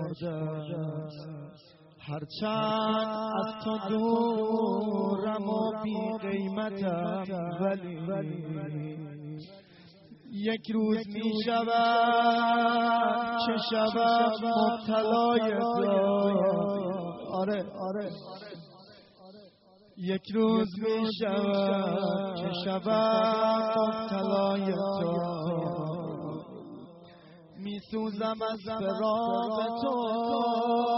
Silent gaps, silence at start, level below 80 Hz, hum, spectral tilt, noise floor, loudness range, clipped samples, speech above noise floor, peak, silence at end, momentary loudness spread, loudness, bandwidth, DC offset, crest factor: none; 0 s; -70 dBFS; none; -4.5 dB/octave; -59 dBFS; 9 LU; under 0.1%; 31 dB; -12 dBFS; 0 s; 14 LU; -29 LUFS; 5.8 kHz; under 0.1%; 16 dB